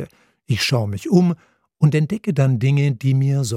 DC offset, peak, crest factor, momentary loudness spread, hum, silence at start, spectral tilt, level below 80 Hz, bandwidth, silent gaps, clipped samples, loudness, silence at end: under 0.1%; -2 dBFS; 16 dB; 5 LU; none; 0 s; -6.5 dB/octave; -58 dBFS; 14.5 kHz; none; under 0.1%; -19 LUFS; 0 s